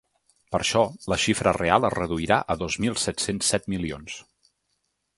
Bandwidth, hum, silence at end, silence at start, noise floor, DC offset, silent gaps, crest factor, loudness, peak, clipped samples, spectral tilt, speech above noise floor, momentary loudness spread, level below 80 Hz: 11.5 kHz; none; 0.95 s; 0.5 s; -75 dBFS; under 0.1%; none; 24 dB; -24 LUFS; -2 dBFS; under 0.1%; -3.5 dB/octave; 51 dB; 9 LU; -48 dBFS